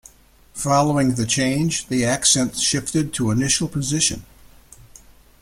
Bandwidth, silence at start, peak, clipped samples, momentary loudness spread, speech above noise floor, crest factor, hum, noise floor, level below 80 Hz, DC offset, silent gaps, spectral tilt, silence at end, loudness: 16.5 kHz; 0.55 s; -2 dBFS; under 0.1%; 6 LU; 31 dB; 20 dB; none; -51 dBFS; -46 dBFS; under 0.1%; none; -3.5 dB/octave; 0.45 s; -19 LUFS